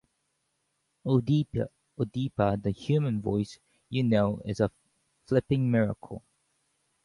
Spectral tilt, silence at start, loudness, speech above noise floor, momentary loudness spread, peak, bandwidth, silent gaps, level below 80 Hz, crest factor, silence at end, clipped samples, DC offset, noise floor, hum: -8.5 dB/octave; 1.05 s; -29 LUFS; 50 dB; 12 LU; -10 dBFS; 11 kHz; none; -56 dBFS; 20 dB; 0.85 s; under 0.1%; under 0.1%; -77 dBFS; none